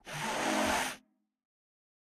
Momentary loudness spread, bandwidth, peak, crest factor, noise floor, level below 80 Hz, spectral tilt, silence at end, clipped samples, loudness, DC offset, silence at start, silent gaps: 9 LU; over 20 kHz; -18 dBFS; 18 dB; -58 dBFS; -62 dBFS; -2.5 dB/octave; 1.2 s; under 0.1%; -32 LUFS; under 0.1%; 0.05 s; none